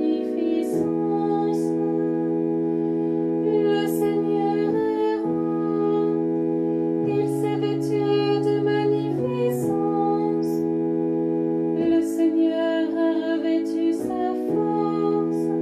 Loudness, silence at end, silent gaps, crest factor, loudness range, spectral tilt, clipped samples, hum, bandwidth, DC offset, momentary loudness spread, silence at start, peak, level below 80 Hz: -23 LUFS; 0 s; none; 12 dB; 1 LU; -7.5 dB/octave; under 0.1%; none; 13.5 kHz; under 0.1%; 3 LU; 0 s; -10 dBFS; -66 dBFS